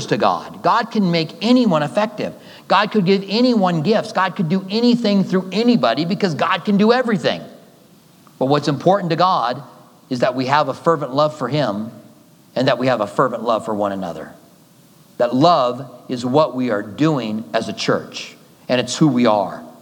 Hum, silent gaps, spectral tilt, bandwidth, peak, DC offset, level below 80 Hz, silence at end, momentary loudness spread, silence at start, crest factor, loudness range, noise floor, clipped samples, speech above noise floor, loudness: none; none; -6 dB/octave; 18.5 kHz; 0 dBFS; under 0.1%; -70 dBFS; 0.1 s; 12 LU; 0 s; 18 dB; 4 LU; -49 dBFS; under 0.1%; 32 dB; -18 LUFS